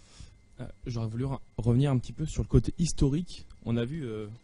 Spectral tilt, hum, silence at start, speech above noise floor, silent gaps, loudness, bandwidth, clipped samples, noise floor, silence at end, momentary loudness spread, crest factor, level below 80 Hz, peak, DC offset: -7 dB/octave; none; 0.15 s; 22 dB; none; -30 LUFS; 11 kHz; under 0.1%; -51 dBFS; 0.05 s; 15 LU; 20 dB; -40 dBFS; -10 dBFS; under 0.1%